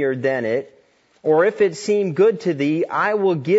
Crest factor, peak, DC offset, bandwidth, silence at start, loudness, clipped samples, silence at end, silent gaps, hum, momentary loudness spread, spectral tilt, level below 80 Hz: 14 dB; -4 dBFS; under 0.1%; 8 kHz; 0 s; -19 LUFS; under 0.1%; 0 s; none; none; 6 LU; -6.5 dB/octave; -70 dBFS